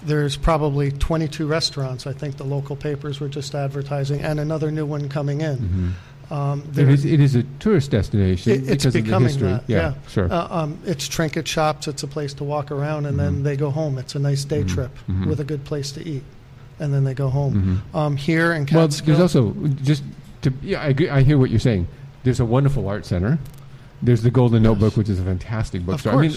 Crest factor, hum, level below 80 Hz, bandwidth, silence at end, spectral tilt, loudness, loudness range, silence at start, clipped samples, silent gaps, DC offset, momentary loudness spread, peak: 16 dB; none; -36 dBFS; 13 kHz; 0 s; -7 dB/octave; -21 LUFS; 6 LU; 0 s; under 0.1%; none; under 0.1%; 11 LU; -4 dBFS